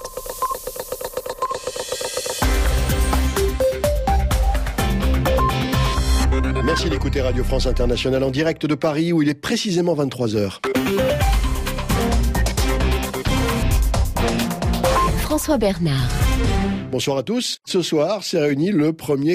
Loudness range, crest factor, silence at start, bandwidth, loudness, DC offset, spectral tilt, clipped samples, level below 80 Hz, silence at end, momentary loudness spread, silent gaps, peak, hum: 1 LU; 12 dB; 0 s; 15.5 kHz; -20 LUFS; under 0.1%; -5 dB/octave; under 0.1%; -24 dBFS; 0 s; 6 LU; none; -6 dBFS; none